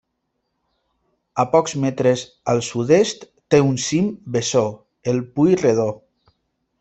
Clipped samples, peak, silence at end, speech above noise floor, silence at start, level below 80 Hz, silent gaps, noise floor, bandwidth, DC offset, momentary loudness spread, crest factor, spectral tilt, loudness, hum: under 0.1%; 0 dBFS; 0.85 s; 56 dB; 1.35 s; -58 dBFS; none; -74 dBFS; 8.4 kHz; under 0.1%; 9 LU; 20 dB; -5.5 dB/octave; -19 LUFS; none